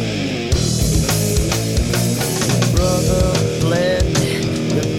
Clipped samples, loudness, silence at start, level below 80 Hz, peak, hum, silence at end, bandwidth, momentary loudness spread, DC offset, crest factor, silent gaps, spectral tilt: under 0.1%; -17 LUFS; 0 s; -26 dBFS; -6 dBFS; none; 0 s; 16.5 kHz; 3 LU; under 0.1%; 12 dB; none; -5 dB/octave